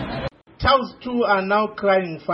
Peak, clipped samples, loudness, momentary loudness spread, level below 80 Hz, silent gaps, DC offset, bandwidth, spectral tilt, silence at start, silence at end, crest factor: -4 dBFS; under 0.1%; -20 LUFS; 10 LU; -40 dBFS; none; under 0.1%; 5.8 kHz; -8 dB/octave; 0 s; 0 s; 18 dB